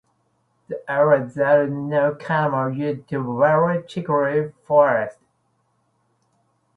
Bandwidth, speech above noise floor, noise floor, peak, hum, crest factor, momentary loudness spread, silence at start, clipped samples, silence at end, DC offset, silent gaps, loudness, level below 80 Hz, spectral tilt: 7.8 kHz; 48 dB; -67 dBFS; -4 dBFS; none; 18 dB; 9 LU; 0.7 s; under 0.1%; 1.65 s; under 0.1%; none; -20 LUFS; -64 dBFS; -8.5 dB/octave